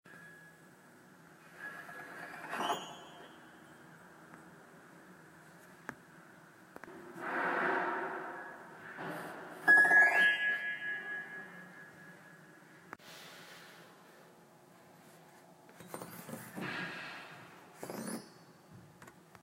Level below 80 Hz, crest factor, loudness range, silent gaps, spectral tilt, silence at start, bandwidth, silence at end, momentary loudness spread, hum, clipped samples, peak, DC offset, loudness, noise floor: -86 dBFS; 24 dB; 25 LU; none; -3 dB/octave; 0.05 s; 16 kHz; 0.3 s; 28 LU; none; under 0.1%; -16 dBFS; under 0.1%; -32 LUFS; -60 dBFS